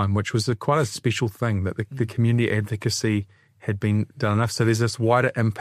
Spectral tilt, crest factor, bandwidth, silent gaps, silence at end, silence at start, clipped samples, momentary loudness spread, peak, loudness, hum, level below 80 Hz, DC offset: -6 dB/octave; 16 dB; 14.5 kHz; none; 0 s; 0 s; under 0.1%; 7 LU; -6 dBFS; -23 LUFS; none; -56 dBFS; under 0.1%